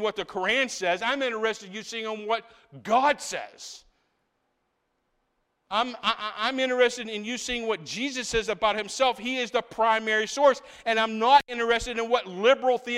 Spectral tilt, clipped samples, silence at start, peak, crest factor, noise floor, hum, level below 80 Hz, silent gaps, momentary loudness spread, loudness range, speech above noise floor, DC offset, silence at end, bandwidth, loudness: -2.5 dB/octave; under 0.1%; 0 s; -6 dBFS; 20 dB; -76 dBFS; none; -56 dBFS; none; 11 LU; 7 LU; 50 dB; under 0.1%; 0 s; 14 kHz; -26 LUFS